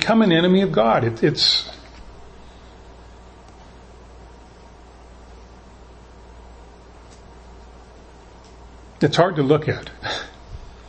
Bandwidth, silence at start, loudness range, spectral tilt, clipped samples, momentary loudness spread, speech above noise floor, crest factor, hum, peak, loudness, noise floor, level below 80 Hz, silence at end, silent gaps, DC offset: 8.8 kHz; 0 s; 24 LU; -5.5 dB/octave; under 0.1%; 23 LU; 27 dB; 24 dB; none; 0 dBFS; -18 LUFS; -44 dBFS; -46 dBFS; 0.2 s; none; under 0.1%